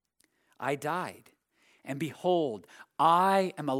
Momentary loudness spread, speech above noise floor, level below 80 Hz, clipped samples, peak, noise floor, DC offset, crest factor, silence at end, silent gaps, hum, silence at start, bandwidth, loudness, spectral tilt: 18 LU; 43 dB; -84 dBFS; under 0.1%; -12 dBFS; -72 dBFS; under 0.1%; 20 dB; 0 s; none; none; 0.6 s; 16.5 kHz; -29 LUFS; -5.5 dB/octave